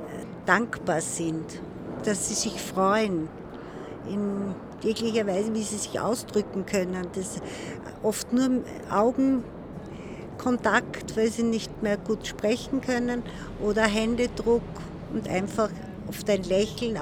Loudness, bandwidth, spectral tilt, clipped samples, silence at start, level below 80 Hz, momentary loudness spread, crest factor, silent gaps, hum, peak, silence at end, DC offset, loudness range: -27 LUFS; 19.5 kHz; -4.5 dB/octave; under 0.1%; 0 s; -50 dBFS; 14 LU; 22 dB; none; none; -6 dBFS; 0 s; under 0.1%; 2 LU